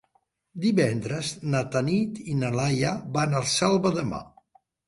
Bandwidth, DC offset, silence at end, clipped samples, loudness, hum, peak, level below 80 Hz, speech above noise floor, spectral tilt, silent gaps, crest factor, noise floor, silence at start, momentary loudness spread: 11.5 kHz; under 0.1%; 0.6 s; under 0.1%; -26 LUFS; none; -10 dBFS; -56 dBFS; 44 dB; -5 dB/octave; none; 16 dB; -69 dBFS; 0.55 s; 7 LU